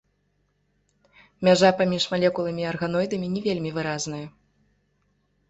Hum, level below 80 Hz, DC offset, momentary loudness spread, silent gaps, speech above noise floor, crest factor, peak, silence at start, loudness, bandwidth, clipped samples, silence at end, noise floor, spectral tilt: none; -60 dBFS; under 0.1%; 12 LU; none; 47 dB; 20 dB; -4 dBFS; 1.4 s; -24 LUFS; 8.2 kHz; under 0.1%; 1.2 s; -70 dBFS; -5 dB/octave